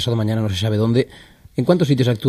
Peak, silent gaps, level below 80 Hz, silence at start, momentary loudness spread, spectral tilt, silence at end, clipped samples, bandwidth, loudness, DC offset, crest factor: -2 dBFS; none; -50 dBFS; 0 s; 8 LU; -7 dB/octave; 0 s; under 0.1%; 13.5 kHz; -19 LUFS; under 0.1%; 16 dB